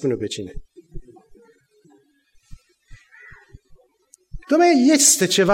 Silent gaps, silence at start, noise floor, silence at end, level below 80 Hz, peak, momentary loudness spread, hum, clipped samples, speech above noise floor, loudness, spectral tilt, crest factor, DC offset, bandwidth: none; 0 s; -58 dBFS; 0 s; -46 dBFS; -2 dBFS; 18 LU; none; under 0.1%; 42 dB; -16 LUFS; -3 dB/octave; 20 dB; under 0.1%; 16 kHz